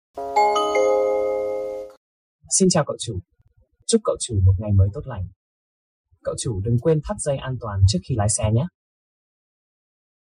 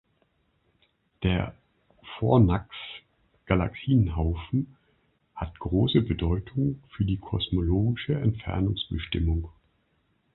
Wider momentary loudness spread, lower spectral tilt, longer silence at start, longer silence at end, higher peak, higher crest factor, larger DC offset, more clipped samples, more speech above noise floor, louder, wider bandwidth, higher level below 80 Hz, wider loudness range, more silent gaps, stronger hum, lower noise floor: about the same, 13 LU vs 15 LU; second, -5 dB/octave vs -11.5 dB/octave; second, 0.15 s vs 1.2 s; first, 1.7 s vs 0.85 s; about the same, -6 dBFS vs -6 dBFS; about the same, 18 dB vs 20 dB; neither; neither; second, 39 dB vs 45 dB; first, -21 LUFS vs -27 LUFS; first, 11.5 kHz vs 4.2 kHz; about the same, -42 dBFS vs -38 dBFS; about the same, 3 LU vs 2 LU; first, 1.97-2.39 s, 5.36-6.04 s vs none; neither; second, -60 dBFS vs -70 dBFS